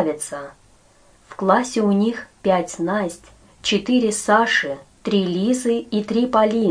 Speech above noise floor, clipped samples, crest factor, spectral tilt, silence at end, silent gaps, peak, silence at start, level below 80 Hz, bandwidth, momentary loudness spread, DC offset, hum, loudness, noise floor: 34 dB; under 0.1%; 18 dB; -4.5 dB/octave; 0 s; none; -2 dBFS; 0 s; -56 dBFS; 10.5 kHz; 12 LU; under 0.1%; none; -20 LUFS; -53 dBFS